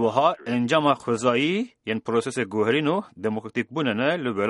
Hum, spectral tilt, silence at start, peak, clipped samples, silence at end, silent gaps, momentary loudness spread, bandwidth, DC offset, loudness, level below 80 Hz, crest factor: none; -5.5 dB/octave; 0 s; -6 dBFS; under 0.1%; 0 s; none; 8 LU; 11.5 kHz; under 0.1%; -24 LUFS; -68 dBFS; 18 dB